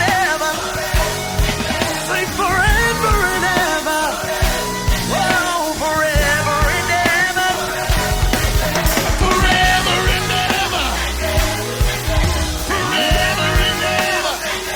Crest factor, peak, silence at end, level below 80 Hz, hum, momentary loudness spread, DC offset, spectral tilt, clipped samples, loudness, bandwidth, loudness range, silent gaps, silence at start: 14 dB; -2 dBFS; 0 s; -24 dBFS; none; 5 LU; under 0.1%; -3 dB/octave; under 0.1%; -16 LUFS; 19.5 kHz; 2 LU; none; 0 s